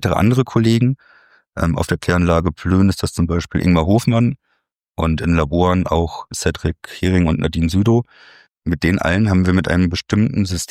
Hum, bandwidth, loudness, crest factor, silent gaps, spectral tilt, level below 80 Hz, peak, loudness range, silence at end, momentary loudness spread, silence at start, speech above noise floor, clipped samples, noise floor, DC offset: none; 15.5 kHz; -17 LUFS; 16 dB; 4.75-4.79 s; -6.5 dB/octave; -32 dBFS; -2 dBFS; 2 LU; 0.05 s; 8 LU; 0 s; 52 dB; under 0.1%; -69 dBFS; under 0.1%